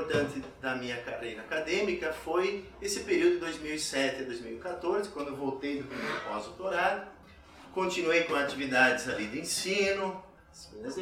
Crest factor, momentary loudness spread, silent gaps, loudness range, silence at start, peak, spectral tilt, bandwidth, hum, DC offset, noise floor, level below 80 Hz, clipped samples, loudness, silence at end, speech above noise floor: 20 dB; 12 LU; none; 5 LU; 0 s; -12 dBFS; -3.5 dB/octave; 16 kHz; none; under 0.1%; -53 dBFS; -60 dBFS; under 0.1%; -31 LUFS; 0 s; 21 dB